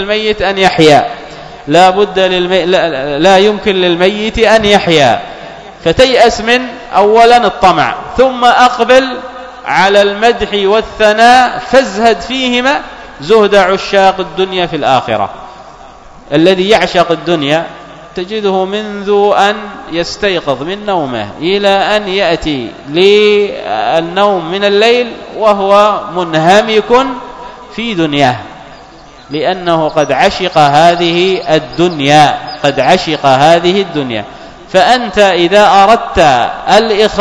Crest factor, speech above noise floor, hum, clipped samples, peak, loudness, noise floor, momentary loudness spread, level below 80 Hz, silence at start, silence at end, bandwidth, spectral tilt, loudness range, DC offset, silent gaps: 10 dB; 25 dB; none; 3%; 0 dBFS; -9 LUFS; -34 dBFS; 11 LU; -36 dBFS; 0 s; 0 s; 11 kHz; -4.5 dB/octave; 4 LU; under 0.1%; none